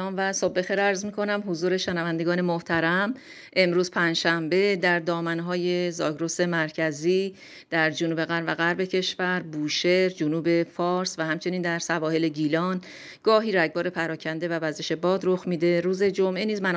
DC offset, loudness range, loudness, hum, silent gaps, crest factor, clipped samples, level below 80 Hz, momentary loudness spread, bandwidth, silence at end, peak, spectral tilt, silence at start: under 0.1%; 2 LU; -25 LUFS; none; none; 18 dB; under 0.1%; -70 dBFS; 6 LU; 9.6 kHz; 0 s; -6 dBFS; -5 dB/octave; 0 s